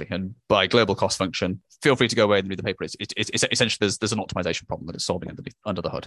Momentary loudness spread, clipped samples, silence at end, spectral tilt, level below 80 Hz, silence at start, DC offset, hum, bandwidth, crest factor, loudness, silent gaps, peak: 11 LU; under 0.1%; 0 s; -4 dB/octave; -50 dBFS; 0 s; under 0.1%; none; 12.5 kHz; 22 dB; -23 LUFS; none; -2 dBFS